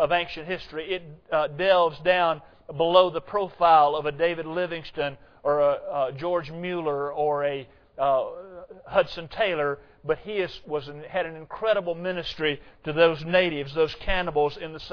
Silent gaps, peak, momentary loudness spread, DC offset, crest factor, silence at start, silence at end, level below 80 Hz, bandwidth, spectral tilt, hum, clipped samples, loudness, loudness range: none; -4 dBFS; 12 LU; under 0.1%; 20 dB; 0 s; 0 s; -48 dBFS; 5.4 kHz; -6.5 dB/octave; none; under 0.1%; -25 LUFS; 6 LU